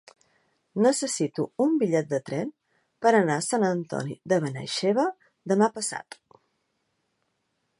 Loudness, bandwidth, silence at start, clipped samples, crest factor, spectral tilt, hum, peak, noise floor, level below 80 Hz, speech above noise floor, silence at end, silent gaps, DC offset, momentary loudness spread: -25 LUFS; 11.5 kHz; 0.75 s; under 0.1%; 18 dB; -5 dB/octave; none; -8 dBFS; -76 dBFS; -74 dBFS; 51 dB; 1.8 s; none; under 0.1%; 10 LU